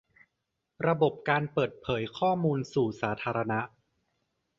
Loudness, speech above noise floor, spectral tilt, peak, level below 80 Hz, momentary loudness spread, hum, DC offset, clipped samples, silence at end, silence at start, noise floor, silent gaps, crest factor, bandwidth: -29 LUFS; 54 dB; -7 dB/octave; -10 dBFS; -62 dBFS; 6 LU; none; under 0.1%; under 0.1%; 0.9 s; 0.8 s; -83 dBFS; none; 20 dB; 7.6 kHz